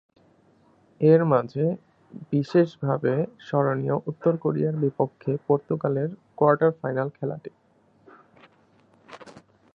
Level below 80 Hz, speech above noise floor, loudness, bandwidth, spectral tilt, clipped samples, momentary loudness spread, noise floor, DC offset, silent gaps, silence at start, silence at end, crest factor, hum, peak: -70 dBFS; 37 dB; -24 LUFS; 6.8 kHz; -10 dB/octave; under 0.1%; 14 LU; -60 dBFS; under 0.1%; none; 1 s; 0.35 s; 20 dB; none; -4 dBFS